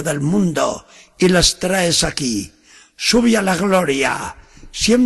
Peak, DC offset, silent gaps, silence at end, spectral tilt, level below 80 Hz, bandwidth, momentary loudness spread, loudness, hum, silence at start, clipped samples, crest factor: -2 dBFS; under 0.1%; none; 0 s; -4 dB/octave; -38 dBFS; 12.5 kHz; 12 LU; -16 LUFS; none; 0 s; under 0.1%; 16 dB